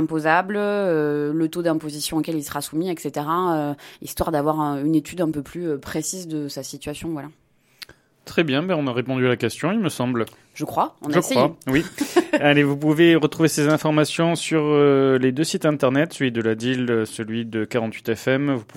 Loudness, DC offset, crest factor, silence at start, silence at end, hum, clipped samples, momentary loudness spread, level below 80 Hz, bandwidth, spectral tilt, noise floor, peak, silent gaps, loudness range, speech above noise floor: -21 LUFS; under 0.1%; 20 dB; 0 s; 0.15 s; none; under 0.1%; 12 LU; -54 dBFS; 16.5 kHz; -5.5 dB/octave; -45 dBFS; -2 dBFS; none; 8 LU; 24 dB